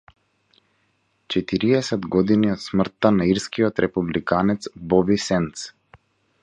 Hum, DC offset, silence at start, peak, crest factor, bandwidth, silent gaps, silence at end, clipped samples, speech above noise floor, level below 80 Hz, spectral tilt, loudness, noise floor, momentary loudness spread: none; under 0.1%; 1.3 s; -2 dBFS; 20 dB; 10 kHz; none; 0.75 s; under 0.1%; 47 dB; -50 dBFS; -6 dB/octave; -21 LUFS; -67 dBFS; 7 LU